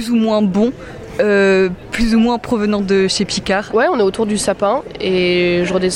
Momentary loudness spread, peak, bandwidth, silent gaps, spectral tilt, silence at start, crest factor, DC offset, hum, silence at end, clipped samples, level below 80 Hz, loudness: 5 LU; -4 dBFS; 15.5 kHz; none; -5 dB/octave; 0 s; 12 dB; under 0.1%; none; 0 s; under 0.1%; -36 dBFS; -15 LUFS